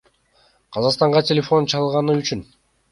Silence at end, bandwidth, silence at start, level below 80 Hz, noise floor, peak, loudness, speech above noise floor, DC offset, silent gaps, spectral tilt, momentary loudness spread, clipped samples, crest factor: 0.5 s; 11.5 kHz; 0.7 s; -56 dBFS; -59 dBFS; -2 dBFS; -19 LUFS; 41 dB; under 0.1%; none; -5.5 dB/octave; 11 LU; under 0.1%; 18 dB